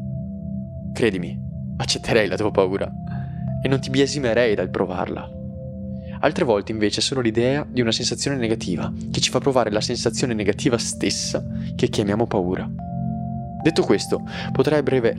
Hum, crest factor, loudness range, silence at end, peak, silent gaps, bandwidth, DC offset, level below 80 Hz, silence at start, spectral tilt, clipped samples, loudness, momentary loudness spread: none; 22 dB; 2 LU; 0 s; 0 dBFS; none; 13 kHz; under 0.1%; -44 dBFS; 0 s; -5 dB/octave; under 0.1%; -22 LUFS; 11 LU